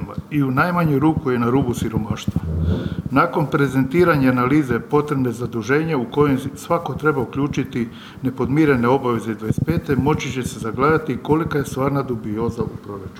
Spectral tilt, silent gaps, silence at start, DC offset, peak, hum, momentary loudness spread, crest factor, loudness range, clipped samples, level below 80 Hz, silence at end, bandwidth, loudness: -7.5 dB/octave; none; 0 s; under 0.1%; -2 dBFS; none; 8 LU; 16 dB; 3 LU; under 0.1%; -40 dBFS; 0 s; 16 kHz; -20 LUFS